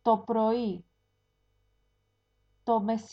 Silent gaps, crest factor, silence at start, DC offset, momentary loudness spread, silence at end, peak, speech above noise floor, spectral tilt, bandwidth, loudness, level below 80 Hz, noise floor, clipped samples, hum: none; 18 dB; 0.05 s; under 0.1%; 12 LU; 0.05 s; -12 dBFS; 47 dB; -7.5 dB/octave; 7.8 kHz; -29 LUFS; -70 dBFS; -75 dBFS; under 0.1%; 50 Hz at -65 dBFS